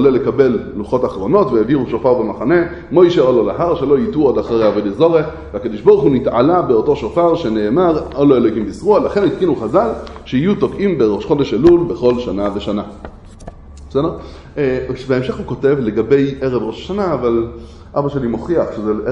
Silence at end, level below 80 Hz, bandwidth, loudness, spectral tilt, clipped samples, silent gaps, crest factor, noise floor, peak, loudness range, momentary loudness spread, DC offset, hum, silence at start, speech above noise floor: 0 s; -38 dBFS; 8.2 kHz; -15 LUFS; -8 dB/octave; under 0.1%; none; 14 dB; -34 dBFS; 0 dBFS; 4 LU; 9 LU; under 0.1%; none; 0 s; 20 dB